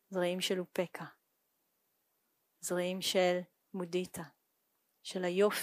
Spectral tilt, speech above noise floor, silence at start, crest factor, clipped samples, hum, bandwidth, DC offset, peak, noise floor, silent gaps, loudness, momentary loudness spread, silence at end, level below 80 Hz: -4 dB/octave; 46 dB; 0.1 s; 20 dB; under 0.1%; none; 15.5 kHz; under 0.1%; -18 dBFS; -80 dBFS; none; -35 LUFS; 17 LU; 0 s; -82 dBFS